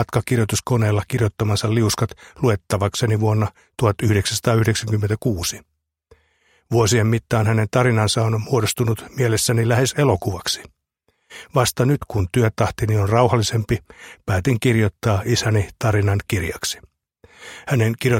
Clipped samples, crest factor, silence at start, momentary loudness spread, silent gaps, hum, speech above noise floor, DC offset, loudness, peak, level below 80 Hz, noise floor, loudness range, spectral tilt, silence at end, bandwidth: under 0.1%; 20 dB; 0 s; 7 LU; none; none; 49 dB; under 0.1%; -20 LUFS; 0 dBFS; -44 dBFS; -68 dBFS; 2 LU; -5.5 dB/octave; 0 s; 16.5 kHz